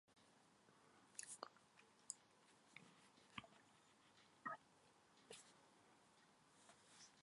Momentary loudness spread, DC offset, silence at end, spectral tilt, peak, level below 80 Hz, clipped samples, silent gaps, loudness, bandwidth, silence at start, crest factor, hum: 15 LU; under 0.1%; 0 s; -1.5 dB/octave; -30 dBFS; under -90 dBFS; under 0.1%; none; -59 LUFS; 11.5 kHz; 0.05 s; 34 dB; none